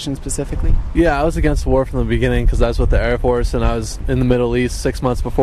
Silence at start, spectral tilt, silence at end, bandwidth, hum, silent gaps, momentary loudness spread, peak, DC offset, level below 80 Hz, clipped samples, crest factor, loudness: 0 s; -6.5 dB/octave; 0 s; 13 kHz; none; none; 6 LU; -2 dBFS; under 0.1%; -20 dBFS; under 0.1%; 14 dB; -18 LUFS